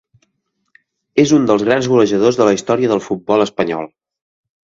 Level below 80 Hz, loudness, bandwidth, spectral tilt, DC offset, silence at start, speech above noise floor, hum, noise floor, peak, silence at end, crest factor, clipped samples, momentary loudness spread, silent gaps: -54 dBFS; -15 LUFS; 7.8 kHz; -5.5 dB/octave; under 0.1%; 1.15 s; 56 dB; none; -70 dBFS; 0 dBFS; 0.9 s; 16 dB; under 0.1%; 8 LU; none